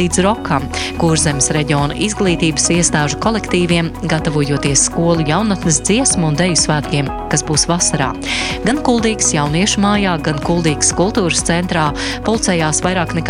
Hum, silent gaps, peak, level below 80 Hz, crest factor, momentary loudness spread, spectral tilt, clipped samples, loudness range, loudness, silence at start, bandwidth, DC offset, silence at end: none; none; 0 dBFS; -32 dBFS; 14 dB; 5 LU; -4 dB/octave; under 0.1%; 1 LU; -14 LUFS; 0 s; 13.5 kHz; under 0.1%; 0 s